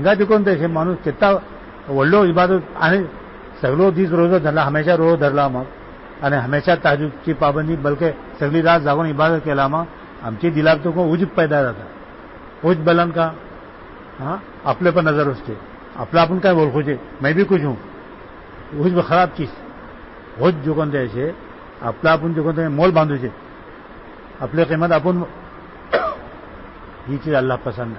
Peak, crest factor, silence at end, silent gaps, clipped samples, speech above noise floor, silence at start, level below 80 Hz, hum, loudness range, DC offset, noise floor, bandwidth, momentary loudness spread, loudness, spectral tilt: -4 dBFS; 14 dB; 0 s; none; under 0.1%; 21 dB; 0 s; -44 dBFS; none; 4 LU; under 0.1%; -38 dBFS; 5.8 kHz; 23 LU; -18 LUFS; -11.5 dB/octave